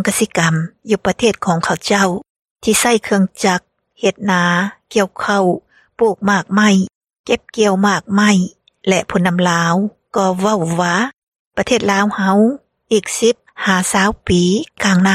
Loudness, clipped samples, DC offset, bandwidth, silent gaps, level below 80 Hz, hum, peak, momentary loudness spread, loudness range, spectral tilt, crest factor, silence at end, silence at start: -15 LUFS; under 0.1%; under 0.1%; 15 kHz; 2.30-2.43 s, 2.50-2.56 s, 6.95-7.01 s, 7.19-7.24 s, 11.13-11.32 s, 11.39-11.51 s; -46 dBFS; none; 0 dBFS; 7 LU; 1 LU; -4.5 dB/octave; 16 dB; 0 s; 0 s